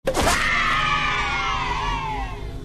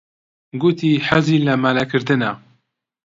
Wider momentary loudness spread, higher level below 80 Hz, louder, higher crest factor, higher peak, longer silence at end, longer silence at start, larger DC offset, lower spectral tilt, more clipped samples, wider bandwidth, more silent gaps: about the same, 9 LU vs 8 LU; first, -32 dBFS vs -54 dBFS; second, -21 LUFS vs -17 LUFS; about the same, 16 dB vs 18 dB; second, -6 dBFS vs 0 dBFS; second, 0 s vs 0.7 s; second, 0.05 s vs 0.55 s; neither; second, -3 dB/octave vs -7 dB/octave; neither; first, 13.5 kHz vs 7.8 kHz; neither